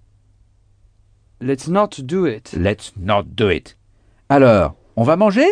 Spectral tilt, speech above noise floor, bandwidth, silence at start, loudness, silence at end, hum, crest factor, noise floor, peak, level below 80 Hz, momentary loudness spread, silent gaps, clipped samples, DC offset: -7 dB/octave; 38 dB; 10 kHz; 1.4 s; -17 LUFS; 0 s; none; 16 dB; -54 dBFS; -2 dBFS; -42 dBFS; 11 LU; none; under 0.1%; under 0.1%